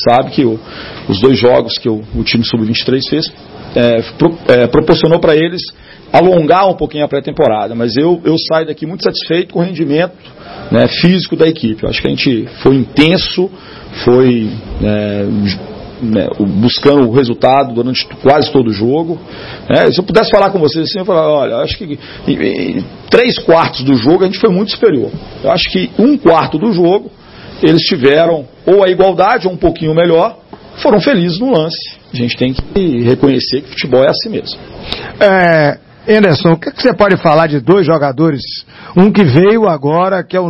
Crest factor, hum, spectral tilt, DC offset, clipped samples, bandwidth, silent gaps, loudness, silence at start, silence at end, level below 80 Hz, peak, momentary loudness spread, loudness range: 10 dB; none; -8 dB/octave; under 0.1%; 0.3%; 7.2 kHz; none; -11 LUFS; 0 s; 0 s; -36 dBFS; 0 dBFS; 10 LU; 3 LU